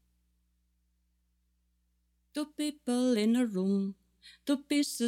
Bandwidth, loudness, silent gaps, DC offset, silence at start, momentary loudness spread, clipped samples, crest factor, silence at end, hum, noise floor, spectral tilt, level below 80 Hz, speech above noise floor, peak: 16 kHz; -31 LUFS; none; under 0.1%; 2.35 s; 12 LU; under 0.1%; 16 dB; 0 s; 60 Hz at -70 dBFS; -75 dBFS; -5 dB/octave; -74 dBFS; 45 dB; -18 dBFS